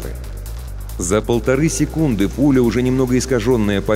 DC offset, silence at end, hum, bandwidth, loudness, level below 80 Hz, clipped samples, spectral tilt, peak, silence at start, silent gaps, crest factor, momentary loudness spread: under 0.1%; 0 s; none; 16 kHz; -17 LUFS; -30 dBFS; under 0.1%; -6 dB/octave; -4 dBFS; 0 s; none; 12 dB; 16 LU